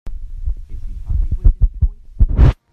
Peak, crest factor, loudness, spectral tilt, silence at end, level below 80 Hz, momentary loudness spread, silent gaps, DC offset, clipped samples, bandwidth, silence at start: 0 dBFS; 14 dB; -19 LUFS; -9.5 dB/octave; 0.2 s; -16 dBFS; 18 LU; none; under 0.1%; under 0.1%; 4.3 kHz; 0.05 s